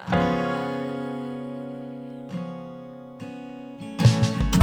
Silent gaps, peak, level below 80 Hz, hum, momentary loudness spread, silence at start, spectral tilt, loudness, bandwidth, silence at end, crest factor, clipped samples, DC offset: none; -4 dBFS; -40 dBFS; none; 18 LU; 0 s; -6.5 dB/octave; -26 LUFS; 19 kHz; 0 s; 22 dB; under 0.1%; under 0.1%